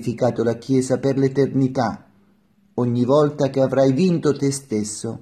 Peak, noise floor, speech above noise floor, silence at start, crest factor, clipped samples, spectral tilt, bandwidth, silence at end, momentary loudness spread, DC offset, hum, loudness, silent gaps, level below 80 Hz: -4 dBFS; -58 dBFS; 39 dB; 0 s; 16 dB; under 0.1%; -6.5 dB/octave; 13 kHz; 0 s; 8 LU; under 0.1%; none; -20 LUFS; none; -60 dBFS